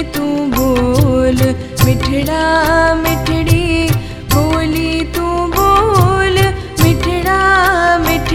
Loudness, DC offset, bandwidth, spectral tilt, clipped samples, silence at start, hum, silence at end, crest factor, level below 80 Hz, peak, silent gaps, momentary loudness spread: -13 LUFS; under 0.1%; 17.5 kHz; -5.5 dB/octave; under 0.1%; 0 s; none; 0 s; 12 dB; -24 dBFS; 0 dBFS; none; 6 LU